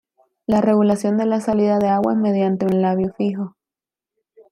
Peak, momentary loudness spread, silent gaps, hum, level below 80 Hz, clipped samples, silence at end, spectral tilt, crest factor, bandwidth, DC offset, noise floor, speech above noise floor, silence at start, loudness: -4 dBFS; 7 LU; none; none; -56 dBFS; under 0.1%; 1.05 s; -8 dB/octave; 16 dB; 11.5 kHz; under 0.1%; -89 dBFS; 72 dB; 0.5 s; -19 LUFS